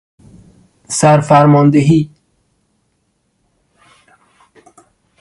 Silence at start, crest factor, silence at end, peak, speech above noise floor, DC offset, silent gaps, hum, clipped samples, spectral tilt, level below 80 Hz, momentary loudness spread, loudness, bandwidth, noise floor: 0.9 s; 16 dB; 3.15 s; 0 dBFS; 54 dB; under 0.1%; none; none; under 0.1%; -6.5 dB/octave; -50 dBFS; 10 LU; -11 LUFS; 11.5 kHz; -64 dBFS